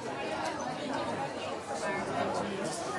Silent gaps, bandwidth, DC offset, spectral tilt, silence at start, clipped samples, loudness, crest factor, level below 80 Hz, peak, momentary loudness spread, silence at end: none; 11.5 kHz; under 0.1%; -4 dB/octave; 0 s; under 0.1%; -35 LUFS; 14 dB; -66 dBFS; -22 dBFS; 3 LU; 0 s